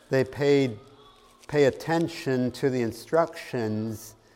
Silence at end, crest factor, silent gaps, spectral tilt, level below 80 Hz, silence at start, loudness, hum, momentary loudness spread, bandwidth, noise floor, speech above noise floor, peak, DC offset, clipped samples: 0.25 s; 18 dB; none; -6.5 dB/octave; -60 dBFS; 0.1 s; -26 LUFS; none; 9 LU; 16 kHz; -54 dBFS; 29 dB; -8 dBFS; under 0.1%; under 0.1%